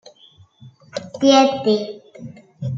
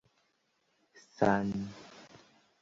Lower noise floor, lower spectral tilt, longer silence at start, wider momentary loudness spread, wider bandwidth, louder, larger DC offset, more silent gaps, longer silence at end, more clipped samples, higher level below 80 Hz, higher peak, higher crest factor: second, -51 dBFS vs -76 dBFS; about the same, -5 dB/octave vs -6 dB/octave; second, 0.65 s vs 1.2 s; about the same, 25 LU vs 24 LU; about the same, 7.6 kHz vs 7.6 kHz; first, -16 LUFS vs -32 LUFS; neither; neither; second, 0 s vs 0.55 s; neither; about the same, -66 dBFS vs -64 dBFS; first, -2 dBFS vs -12 dBFS; about the same, 20 dB vs 24 dB